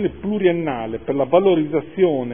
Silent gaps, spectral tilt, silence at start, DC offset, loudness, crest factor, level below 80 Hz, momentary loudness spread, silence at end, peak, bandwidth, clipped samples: none; -11.5 dB/octave; 0 s; 0.5%; -19 LUFS; 16 dB; -50 dBFS; 9 LU; 0 s; -2 dBFS; 3.6 kHz; under 0.1%